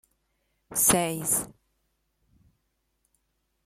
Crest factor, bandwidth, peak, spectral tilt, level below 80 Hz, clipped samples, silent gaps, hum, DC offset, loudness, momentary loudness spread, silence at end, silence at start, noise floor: 24 dB; 16.5 kHz; -8 dBFS; -2.5 dB/octave; -60 dBFS; under 0.1%; none; none; under 0.1%; -24 LUFS; 11 LU; 2.2 s; 0.7 s; -76 dBFS